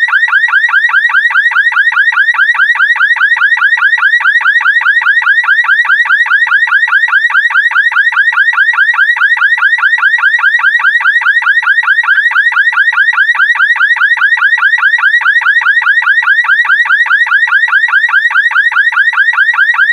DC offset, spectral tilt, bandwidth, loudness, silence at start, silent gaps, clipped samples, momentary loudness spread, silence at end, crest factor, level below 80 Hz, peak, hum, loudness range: under 0.1%; 4 dB/octave; 11.5 kHz; -6 LUFS; 0 s; none; under 0.1%; 1 LU; 0 s; 8 dB; -64 dBFS; 0 dBFS; none; 0 LU